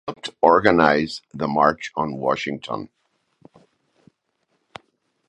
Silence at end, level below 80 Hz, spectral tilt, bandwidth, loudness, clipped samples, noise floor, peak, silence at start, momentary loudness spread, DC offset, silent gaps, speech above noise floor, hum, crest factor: 2.45 s; -56 dBFS; -5.5 dB/octave; 10.5 kHz; -20 LUFS; under 0.1%; -71 dBFS; 0 dBFS; 0.05 s; 16 LU; under 0.1%; none; 51 dB; none; 22 dB